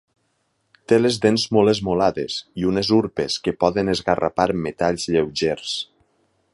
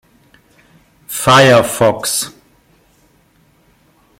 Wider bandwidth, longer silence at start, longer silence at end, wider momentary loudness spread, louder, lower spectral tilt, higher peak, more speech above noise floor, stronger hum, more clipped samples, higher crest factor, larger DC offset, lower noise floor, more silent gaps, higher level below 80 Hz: second, 11.5 kHz vs 16.5 kHz; second, 0.9 s vs 1.1 s; second, 0.7 s vs 1.9 s; second, 8 LU vs 15 LU; second, -20 LUFS vs -11 LUFS; first, -5 dB/octave vs -3.5 dB/octave; about the same, -2 dBFS vs 0 dBFS; first, 49 dB vs 43 dB; neither; neither; about the same, 18 dB vs 16 dB; neither; first, -69 dBFS vs -53 dBFS; neither; about the same, -50 dBFS vs -50 dBFS